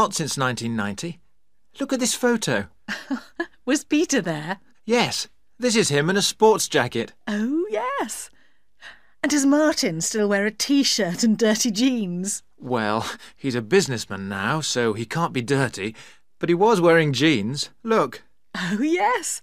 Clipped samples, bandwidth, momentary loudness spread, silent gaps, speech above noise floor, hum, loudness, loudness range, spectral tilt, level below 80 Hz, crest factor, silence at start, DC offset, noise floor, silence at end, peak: under 0.1%; 15.5 kHz; 12 LU; none; 49 dB; none; -22 LUFS; 4 LU; -4 dB/octave; -62 dBFS; 20 dB; 0 s; 0.3%; -71 dBFS; 0.05 s; -4 dBFS